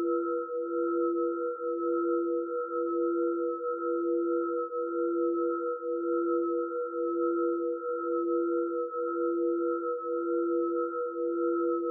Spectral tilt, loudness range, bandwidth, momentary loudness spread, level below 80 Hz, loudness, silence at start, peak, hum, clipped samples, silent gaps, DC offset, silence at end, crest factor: 10.5 dB/octave; 0 LU; 1.5 kHz; 4 LU; under -90 dBFS; -31 LUFS; 0 s; -20 dBFS; none; under 0.1%; none; under 0.1%; 0 s; 10 dB